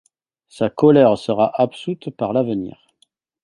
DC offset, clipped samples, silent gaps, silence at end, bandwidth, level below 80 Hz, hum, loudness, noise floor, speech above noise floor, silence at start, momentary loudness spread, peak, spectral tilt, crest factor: under 0.1%; under 0.1%; none; 0.75 s; 11 kHz; -58 dBFS; none; -18 LUFS; -63 dBFS; 46 dB; 0.6 s; 15 LU; 0 dBFS; -8 dB/octave; 18 dB